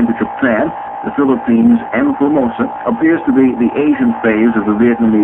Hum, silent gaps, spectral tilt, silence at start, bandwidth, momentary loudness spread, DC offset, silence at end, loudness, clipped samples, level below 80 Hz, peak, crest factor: none; none; -9.5 dB/octave; 0 s; 3.6 kHz; 6 LU; under 0.1%; 0 s; -13 LUFS; under 0.1%; -46 dBFS; 0 dBFS; 12 dB